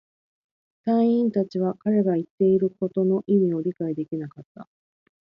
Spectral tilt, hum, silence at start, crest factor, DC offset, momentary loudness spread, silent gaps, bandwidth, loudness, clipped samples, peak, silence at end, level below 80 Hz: -11 dB/octave; none; 0.85 s; 14 dB; under 0.1%; 10 LU; 2.30-2.38 s, 4.45-4.55 s; 5.6 kHz; -23 LUFS; under 0.1%; -10 dBFS; 0.7 s; -70 dBFS